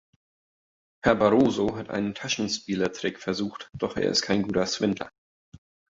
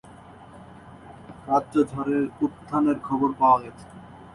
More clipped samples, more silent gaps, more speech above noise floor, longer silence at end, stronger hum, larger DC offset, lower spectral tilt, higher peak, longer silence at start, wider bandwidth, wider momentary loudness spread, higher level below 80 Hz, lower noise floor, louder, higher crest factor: neither; first, 5.18-5.52 s vs none; first, over 65 dB vs 23 dB; first, 0.35 s vs 0.05 s; neither; neither; second, -4.5 dB/octave vs -8 dB/octave; about the same, -6 dBFS vs -8 dBFS; first, 1.05 s vs 0.4 s; second, 8 kHz vs 11.5 kHz; second, 11 LU vs 24 LU; about the same, -54 dBFS vs -58 dBFS; first, under -90 dBFS vs -46 dBFS; about the same, -26 LUFS vs -24 LUFS; about the same, 22 dB vs 18 dB